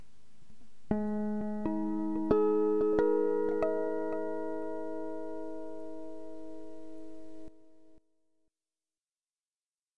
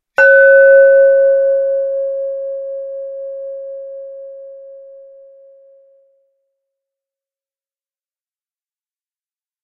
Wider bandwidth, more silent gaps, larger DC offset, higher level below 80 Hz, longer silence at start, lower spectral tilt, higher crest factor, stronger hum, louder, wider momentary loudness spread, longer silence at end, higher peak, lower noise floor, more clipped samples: first, 6.2 kHz vs 5.4 kHz; neither; first, 1% vs under 0.1%; first, -62 dBFS vs -72 dBFS; first, 0.5 s vs 0.2 s; first, -9 dB/octave vs -2 dB/octave; first, 22 dB vs 16 dB; neither; second, -32 LUFS vs -10 LUFS; second, 21 LU vs 24 LU; second, 0 s vs 4.85 s; second, -14 dBFS vs 0 dBFS; about the same, under -90 dBFS vs under -90 dBFS; neither